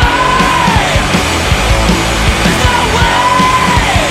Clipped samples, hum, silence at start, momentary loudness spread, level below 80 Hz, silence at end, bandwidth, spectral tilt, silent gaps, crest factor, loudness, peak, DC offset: under 0.1%; none; 0 s; 2 LU; -18 dBFS; 0 s; 16 kHz; -4 dB/octave; none; 10 dB; -10 LUFS; 0 dBFS; under 0.1%